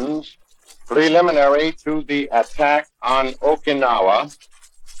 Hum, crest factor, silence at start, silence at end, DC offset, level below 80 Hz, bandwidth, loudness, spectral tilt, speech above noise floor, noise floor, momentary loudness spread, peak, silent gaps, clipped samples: none; 16 dB; 0 s; 0 s; under 0.1%; -44 dBFS; 11.5 kHz; -18 LUFS; -4.5 dB/octave; 31 dB; -49 dBFS; 8 LU; -4 dBFS; none; under 0.1%